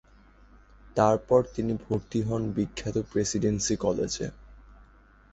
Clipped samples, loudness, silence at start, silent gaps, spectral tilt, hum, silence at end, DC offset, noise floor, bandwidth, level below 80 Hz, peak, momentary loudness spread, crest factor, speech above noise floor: under 0.1%; -28 LUFS; 0.85 s; none; -5.5 dB/octave; none; 0.6 s; under 0.1%; -56 dBFS; 8.2 kHz; -50 dBFS; -8 dBFS; 7 LU; 20 dB; 29 dB